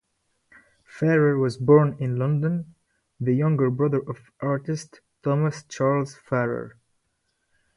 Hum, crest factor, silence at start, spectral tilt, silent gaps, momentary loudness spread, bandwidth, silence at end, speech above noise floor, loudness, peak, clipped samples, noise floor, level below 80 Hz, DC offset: none; 20 dB; 0.95 s; -8 dB/octave; none; 14 LU; 11 kHz; 1.05 s; 51 dB; -24 LUFS; -4 dBFS; under 0.1%; -74 dBFS; -62 dBFS; under 0.1%